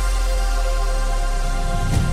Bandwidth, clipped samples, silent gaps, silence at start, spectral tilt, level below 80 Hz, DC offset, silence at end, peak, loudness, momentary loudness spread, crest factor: 14.5 kHz; under 0.1%; none; 0 s; -5 dB/octave; -20 dBFS; under 0.1%; 0 s; -8 dBFS; -23 LUFS; 3 LU; 10 dB